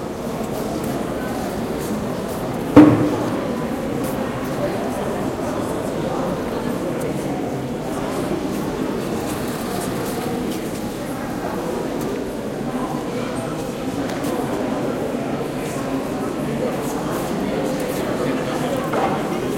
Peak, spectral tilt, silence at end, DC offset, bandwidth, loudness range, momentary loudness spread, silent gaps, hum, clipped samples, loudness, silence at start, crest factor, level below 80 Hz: 0 dBFS; -6 dB/octave; 0 s; under 0.1%; 16.5 kHz; 6 LU; 4 LU; none; none; under 0.1%; -22 LUFS; 0 s; 22 dB; -44 dBFS